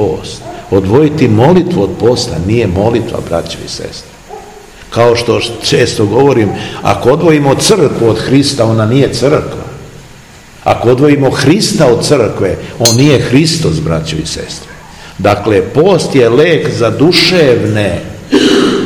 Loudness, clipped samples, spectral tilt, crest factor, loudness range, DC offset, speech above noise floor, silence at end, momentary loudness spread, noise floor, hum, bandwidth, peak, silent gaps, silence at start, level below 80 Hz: -9 LUFS; 2%; -5 dB/octave; 10 dB; 4 LU; 0.2%; 25 dB; 0 s; 13 LU; -34 dBFS; none; over 20 kHz; 0 dBFS; none; 0 s; -36 dBFS